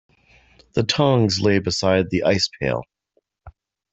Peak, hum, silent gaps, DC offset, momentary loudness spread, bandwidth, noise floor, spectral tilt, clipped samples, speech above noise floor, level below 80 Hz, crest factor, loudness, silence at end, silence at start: -4 dBFS; none; none; under 0.1%; 8 LU; 8.2 kHz; -69 dBFS; -5 dB/octave; under 0.1%; 49 dB; -50 dBFS; 18 dB; -20 LUFS; 0.4 s; 0.75 s